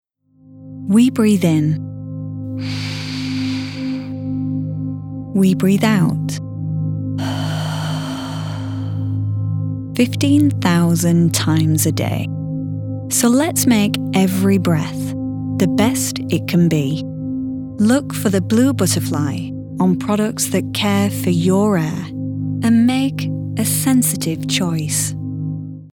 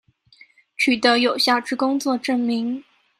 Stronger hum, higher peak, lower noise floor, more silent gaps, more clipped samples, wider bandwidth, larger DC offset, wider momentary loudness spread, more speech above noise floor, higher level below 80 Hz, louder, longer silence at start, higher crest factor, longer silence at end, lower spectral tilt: neither; about the same, 0 dBFS vs -2 dBFS; second, -49 dBFS vs -53 dBFS; neither; neither; first, 19 kHz vs 15 kHz; neither; about the same, 10 LU vs 11 LU; about the same, 33 dB vs 33 dB; first, -50 dBFS vs -70 dBFS; about the same, -18 LUFS vs -20 LUFS; second, 0.5 s vs 0.8 s; about the same, 18 dB vs 20 dB; second, 0 s vs 0.4 s; first, -5.5 dB/octave vs -3 dB/octave